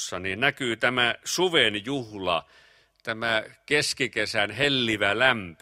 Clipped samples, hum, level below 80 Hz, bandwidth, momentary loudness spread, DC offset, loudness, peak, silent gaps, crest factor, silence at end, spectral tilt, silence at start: under 0.1%; none; -60 dBFS; 16 kHz; 9 LU; under 0.1%; -24 LUFS; -4 dBFS; none; 22 dB; 0.05 s; -3 dB/octave; 0 s